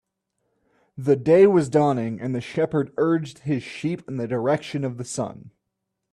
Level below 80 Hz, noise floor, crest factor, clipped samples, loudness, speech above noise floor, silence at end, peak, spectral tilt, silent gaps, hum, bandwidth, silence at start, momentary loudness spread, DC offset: -62 dBFS; -80 dBFS; 18 dB; under 0.1%; -23 LUFS; 58 dB; 0.65 s; -6 dBFS; -7 dB/octave; none; none; 11.5 kHz; 0.95 s; 14 LU; under 0.1%